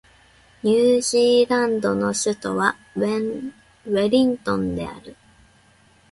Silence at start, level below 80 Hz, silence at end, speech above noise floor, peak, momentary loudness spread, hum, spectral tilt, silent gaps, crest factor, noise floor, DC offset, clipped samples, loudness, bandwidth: 0.65 s; -54 dBFS; 1 s; 35 dB; -2 dBFS; 14 LU; none; -4.5 dB/octave; none; 18 dB; -55 dBFS; under 0.1%; under 0.1%; -20 LUFS; 11.5 kHz